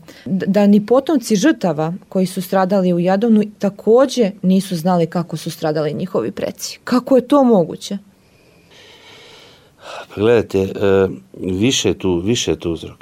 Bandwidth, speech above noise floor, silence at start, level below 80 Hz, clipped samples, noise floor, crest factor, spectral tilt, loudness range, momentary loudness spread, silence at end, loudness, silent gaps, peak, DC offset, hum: 16 kHz; 34 dB; 0.1 s; -52 dBFS; under 0.1%; -50 dBFS; 14 dB; -5.5 dB/octave; 4 LU; 11 LU; 0.1 s; -16 LUFS; none; -2 dBFS; under 0.1%; none